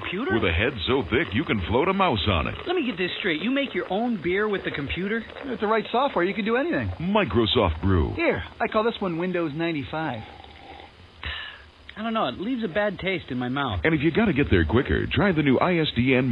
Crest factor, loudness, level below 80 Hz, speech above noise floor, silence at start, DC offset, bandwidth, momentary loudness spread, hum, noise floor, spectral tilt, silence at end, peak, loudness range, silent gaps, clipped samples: 18 dB; -24 LUFS; -40 dBFS; 22 dB; 0 s; under 0.1%; 5.4 kHz; 11 LU; none; -46 dBFS; -8.5 dB/octave; 0 s; -6 dBFS; 7 LU; none; under 0.1%